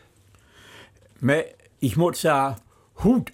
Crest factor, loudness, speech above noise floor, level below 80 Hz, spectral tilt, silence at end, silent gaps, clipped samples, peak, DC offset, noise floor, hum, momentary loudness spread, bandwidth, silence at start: 16 dB; -23 LUFS; 35 dB; -48 dBFS; -6 dB/octave; 0.05 s; none; under 0.1%; -8 dBFS; under 0.1%; -56 dBFS; none; 8 LU; 16.5 kHz; 0.8 s